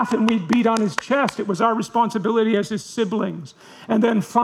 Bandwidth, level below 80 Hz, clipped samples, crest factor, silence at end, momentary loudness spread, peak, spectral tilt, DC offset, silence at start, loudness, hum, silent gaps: 13 kHz; -64 dBFS; under 0.1%; 20 dB; 0 s; 8 LU; 0 dBFS; -5.5 dB/octave; under 0.1%; 0 s; -20 LUFS; none; none